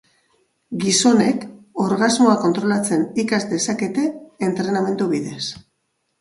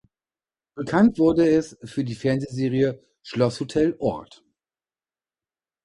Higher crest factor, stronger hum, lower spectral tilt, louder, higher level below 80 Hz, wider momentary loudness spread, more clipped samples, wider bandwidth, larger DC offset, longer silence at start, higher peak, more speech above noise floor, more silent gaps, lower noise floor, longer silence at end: about the same, 18 dB vs 18 dB; neither; second, -4 dB/octave vs -7 dB/octave; first, -19 LUFS vs -23 LUFS; second, -62 dBFS vs -54 dBFS; second, 12 LU vs 15 LU; neither; about the same, 11.5 kHz vs 11 kHz; neither; about the same, 0.7 s vs 0.75 s; first, -2 dBFS vs -6 dBFS; second, 53 dB vs over 68 dB; neither; second, -71 dBFS vs under -90 dBFS; second, 0.65 s vs 1.6 s